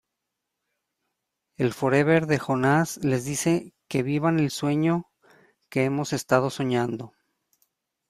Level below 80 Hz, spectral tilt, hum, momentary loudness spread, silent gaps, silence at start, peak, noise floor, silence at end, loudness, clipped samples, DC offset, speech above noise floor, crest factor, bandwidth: -62 dBFS; -6 dB/octave; none; 8 LU; none; 1.6 s; -6 dBFS; -83 dBFS; 1.05 s; -24 LUFS; under 0.1%; under 0.1%; 59 dB; 20 dB; 15 kHz